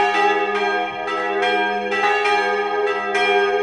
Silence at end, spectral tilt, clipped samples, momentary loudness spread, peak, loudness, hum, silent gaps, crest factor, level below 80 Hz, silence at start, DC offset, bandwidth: 0 s; -3 dB/octave; under 0.1%; 5 LU; -6 dBFS; -19 LUFS; none; none; 14 dB; -58 dBFS; 0 s; under 0.1%; 10.5 kHz